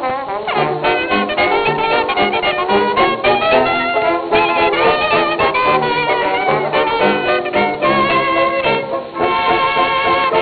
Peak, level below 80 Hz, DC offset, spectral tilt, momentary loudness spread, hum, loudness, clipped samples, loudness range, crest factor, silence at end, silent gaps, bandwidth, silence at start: 0 dBFS; -44 dBFS; under 0.1%; -8.5 dB/octave; 4 LU; none; -14 LUFS; under 0.1%; 1 LU; 14 dB; 0 s; none; 5 kHz; 0 s